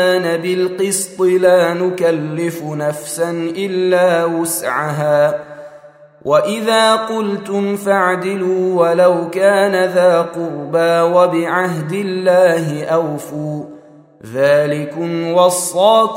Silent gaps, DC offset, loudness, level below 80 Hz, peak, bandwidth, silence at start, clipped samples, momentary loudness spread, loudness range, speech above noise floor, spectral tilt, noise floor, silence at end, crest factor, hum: none; under 0.1%; -15 LUFS; -64 dBFS; 0 dBFS; 16 kHz; 0 s; under 0.1%; 9 LU; 3 LU; 27 dB; -4.5 dB/octave; -41 dBFS; 0 s; 14 dB; none